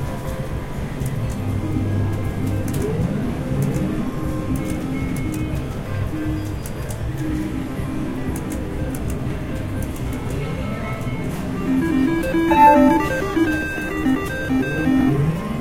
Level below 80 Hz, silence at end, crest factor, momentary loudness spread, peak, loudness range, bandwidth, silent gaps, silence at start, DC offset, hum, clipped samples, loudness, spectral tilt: -32 dBFS; 0 s; 20 dB; 9 LU; -2 dBFS; 9 LU; 17 kHz; none; 0 s; under 0.1%; none; under 0.1%; -22 LUFS; -7 dB/octave